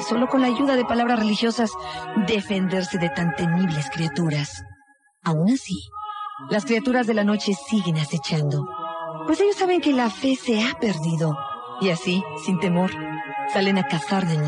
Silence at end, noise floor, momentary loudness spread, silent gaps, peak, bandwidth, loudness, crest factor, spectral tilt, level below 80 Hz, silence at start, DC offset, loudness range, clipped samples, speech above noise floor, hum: 0 s; -58 dBFS; 10 LU; none; -10 dBFS; 10.5 kHz; -23 LUFS; 12 dB; -6 dB/octave; -58 dBFS; 0 s; under 0.1%; 2 LU; under 0.1%; 36 dB; none